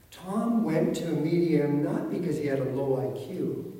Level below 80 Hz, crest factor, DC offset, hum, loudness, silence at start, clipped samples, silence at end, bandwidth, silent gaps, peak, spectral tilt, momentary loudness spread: -64 dBFS; 16 dB; under 0.1%; none; -28 LUFS; 0.1 s; under 0.1%; 0 s; 16 kHz; none; -12 dBFS; -7.5 dB/octave; 8 LU